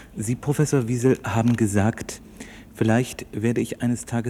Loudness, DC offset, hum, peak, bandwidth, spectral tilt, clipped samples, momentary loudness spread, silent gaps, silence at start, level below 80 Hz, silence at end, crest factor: -23 LUFS; under 0.1%; none; -6 dBFS; 15 kHz; -6.5 dB/octave; under 0.1%; 15 LU; none; 0 s; -50 dBFS; 0 s; 18 dB